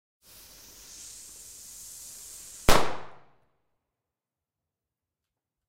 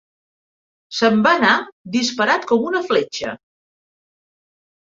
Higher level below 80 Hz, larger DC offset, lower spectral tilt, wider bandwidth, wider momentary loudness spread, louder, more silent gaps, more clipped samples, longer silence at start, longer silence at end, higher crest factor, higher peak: first, -40 dBFS vs -62 dBFS; neither; about the same, -3 dB/octave vs -4 dB/octave; first, 16 kHz vs 7.8 kHz; first, 25 LU vs 14 LU; second, -31 LUFS vs -17 LUFS; second, none vs 1.72-1.85 s; neither; first, 2.7 s vs 0.9 s; first, 2.6 s vs 1.5 s; about the same, 22 dB vs 20 dB; second, -8 dBFS vs -2 dBFS